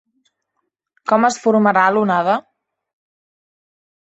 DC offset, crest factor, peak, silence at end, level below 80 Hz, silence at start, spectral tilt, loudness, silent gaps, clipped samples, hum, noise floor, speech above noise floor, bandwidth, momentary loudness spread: under 0.1%; 18 dB; -2 dBFS; 1.65 s; -66 dBFS; 1.05 s; -5.5 dB/octave; -16 LUFS; none; under 0.1%; none; -74 dBFS; 59 dB; 8.2 kHz; 7 LU